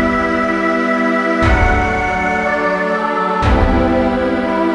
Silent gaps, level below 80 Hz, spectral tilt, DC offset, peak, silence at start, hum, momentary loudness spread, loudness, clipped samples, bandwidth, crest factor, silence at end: none; -22 dBFS; -7 dB/octave; under 0.1%; 0 dBFS; 0 s; none; 3 LU; -15 LUFS; under 0.1%; 10.5 kHz; 14 dB; 0 s